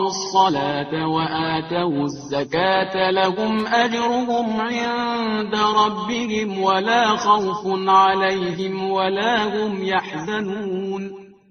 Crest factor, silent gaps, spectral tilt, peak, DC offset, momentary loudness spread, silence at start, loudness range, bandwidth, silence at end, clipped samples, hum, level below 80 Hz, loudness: 18 dB; none; -2.5 dB/octave; -4 dBFS; under 0.1%; 8 LU; 0 s; 3 LU; 6.8 kHz; 0.2 s; under 0.1%; none; -56 dBFS; -20 LUFS